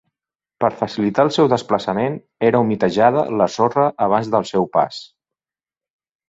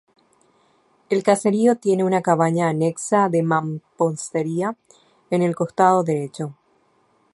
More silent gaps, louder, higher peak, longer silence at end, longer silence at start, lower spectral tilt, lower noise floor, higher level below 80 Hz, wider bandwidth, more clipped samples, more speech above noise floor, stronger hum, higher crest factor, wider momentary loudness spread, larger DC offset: neither; about the same, -18 LUFS vs -20 LUFS; about the same, -2 dBFS vs -2 dBFS; first, 1.25 s vs 0.8 s; second, 0.6 s vs 1.1 s; about the same, -6.5 dB/octave vs -6.5 dB/octave; first, under -90 dBFS vs -62 dBFS; first, -58 dBFS vs -70 dBFS; second, 8 kHz vs 11.5 kHz; neither; first, over 73 dB vs 42 dB; neither; about the same, 18 dB vs 20 dB; second, 6 LU vs 10 LU; neither